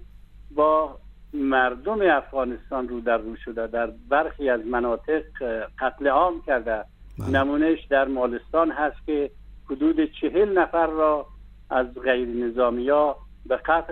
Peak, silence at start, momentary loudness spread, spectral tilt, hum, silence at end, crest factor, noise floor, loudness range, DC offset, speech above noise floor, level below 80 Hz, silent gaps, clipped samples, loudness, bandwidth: -6 dBFS; 0 s; 9 LU; -7.5 dB/octave; 50 Hz at -50 dBFS; 0 s; 16 dB; -45 dBFS; 2 LU; under 0.1%; 22 dB; -44 dBFS; none; under 0.1%; -24 LUFS; 6.6 kHz